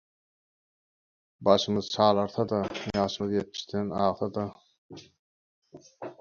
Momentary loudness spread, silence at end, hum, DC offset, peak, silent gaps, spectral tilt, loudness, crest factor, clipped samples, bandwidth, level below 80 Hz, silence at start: 11 LU; 0.1 s; none; under 0.1%; -6 dBFS; 4.78-4.89 s, 5.19-5.62 s; -5.5 dB/octave; -28 LUFS; 24 dB; under 0.1%; 7.2 kHz; -60 dBFS; 1.4 s